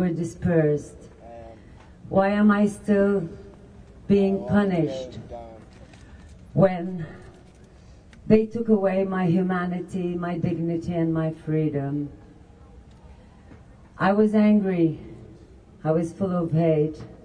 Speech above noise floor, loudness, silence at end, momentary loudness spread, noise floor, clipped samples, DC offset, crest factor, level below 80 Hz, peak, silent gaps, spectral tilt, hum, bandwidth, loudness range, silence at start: 27 dB; -23 LUFS; 0.1 s; 19 LU; -49 dBFS; under 0.1%; under 0.1%; 20 dB; -50 dBFS; -4 dBFS; none; -8.5 dB/octave; none; 10.5 kHz; 6 LU; 0 s